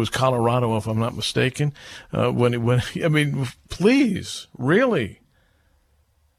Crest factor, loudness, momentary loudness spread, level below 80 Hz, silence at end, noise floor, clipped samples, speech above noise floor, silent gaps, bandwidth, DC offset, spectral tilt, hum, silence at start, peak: 16 dB; -22 LUFS; 10 LU; -50 dBFS; 1.25 s; -63 dBFS; under 0.1%; 41 dB; none; 14.5 kHz; under 0.1%; -6 dB/octave; none; 0 s; -6 dBFS